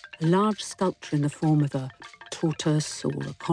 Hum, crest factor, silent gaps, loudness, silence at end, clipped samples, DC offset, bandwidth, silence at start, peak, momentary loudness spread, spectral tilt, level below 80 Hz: none; 14 dB; none; -26 LUFS; 0 s; under 0.1%; under 0.1%; 10.5 kHz; 0 s; -12 dBFS; 10 LU; -6 dB/octave; -64 dBFS